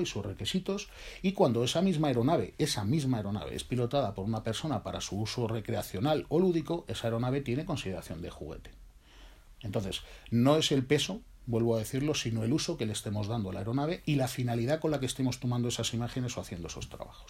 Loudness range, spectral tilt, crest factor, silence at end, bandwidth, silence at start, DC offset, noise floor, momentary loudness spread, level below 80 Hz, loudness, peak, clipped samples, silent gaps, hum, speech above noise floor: 4 LU; -5.5 dB/octave; 20 dB; 0 s; 16 kHz; 0 s; under 0.1%; -54 dBFS; 11 LU; -54 dBFS; -32 LUFS; -10 dBFS; under 0.1%; none; none; 23 dB